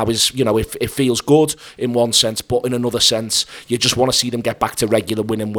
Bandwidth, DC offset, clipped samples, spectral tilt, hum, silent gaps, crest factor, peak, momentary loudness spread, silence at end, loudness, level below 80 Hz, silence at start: over 20 kHz; under 0.1%; under 0.1%; -3.5 dB/octave; none; none; 18 dB; 0 dBFS; 7 LU; 0 s; -17 LUFS; -44 dBFS; 0 s